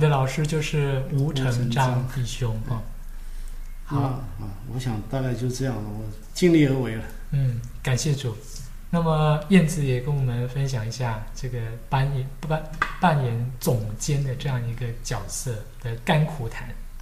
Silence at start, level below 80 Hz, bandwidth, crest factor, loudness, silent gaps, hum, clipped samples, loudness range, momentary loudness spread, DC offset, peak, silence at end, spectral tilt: 0 s; -36 dBFS; 15.5 kHz; 18 dB; -25 LUFS; none; none; under 0.1%; 6 LU; 13 LU; under 0.1%; -6 dBFS; 0 s; -6 dB/octave